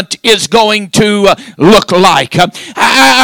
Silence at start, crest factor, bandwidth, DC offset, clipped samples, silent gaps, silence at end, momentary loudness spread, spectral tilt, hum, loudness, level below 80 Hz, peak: 0 s; 8 dB; over 20 kHz; under 0.1%; 7%; none; 0 s; 6 LU; -3.5 dB/octave; none; -8 LUFS; -38 dBFS; 0 dBFS